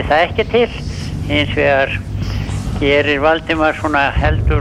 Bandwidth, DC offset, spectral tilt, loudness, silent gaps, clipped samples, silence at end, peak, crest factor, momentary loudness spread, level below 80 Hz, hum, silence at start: 12.5 kHz; under 0.1%; -6 dB/octave; -16 LUFS; none; under 0.1%; 0 s; -2 dBFS; 14 dB; 8 LU; -24 dBFS; none; 0 s